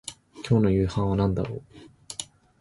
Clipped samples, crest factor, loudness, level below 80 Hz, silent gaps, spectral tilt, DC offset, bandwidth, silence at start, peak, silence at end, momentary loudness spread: under 0.1%; 16 dB; -25 LUFS; -42 dBFS; none; -7 dB/octave; under 0.1%; 11.5 kHz; 0.05 s; -10 dBFS; 0.35 s; 18 LU